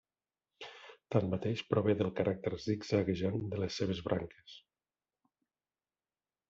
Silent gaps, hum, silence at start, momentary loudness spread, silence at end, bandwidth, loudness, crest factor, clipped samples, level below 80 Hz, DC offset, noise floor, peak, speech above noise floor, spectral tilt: none; none; 0.6 s; 18 LU; 1.9 s; 7.8 kHz; -35 LUFS; 22 dB; under 0.1%; -66 dBFS; under 0.1%; under -90 dBFS; -14 dBFS; over 56 dB; -6.5 dB/octave